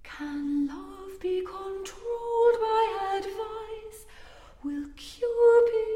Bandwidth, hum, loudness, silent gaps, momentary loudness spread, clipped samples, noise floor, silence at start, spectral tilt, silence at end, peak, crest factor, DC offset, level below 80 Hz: 12.5 kHz; none; -27 LUFS; none; 20 LU; under 0.1%; -49 dBFS; 0.05 s; -4.5 dB/octave; 0 s; -10 dBFS; 16 dB; under 0.1%; -54 dBFS